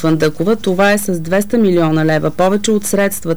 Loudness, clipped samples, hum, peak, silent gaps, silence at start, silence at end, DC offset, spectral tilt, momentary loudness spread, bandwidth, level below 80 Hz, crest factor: -14 LUFS; under 0.1%; none; -4 dBFS; none; 0 s; 0 s; 5%; -5.5 dB/octave; 4 LU; over 20 kHz; -44 dBFS; 10 dB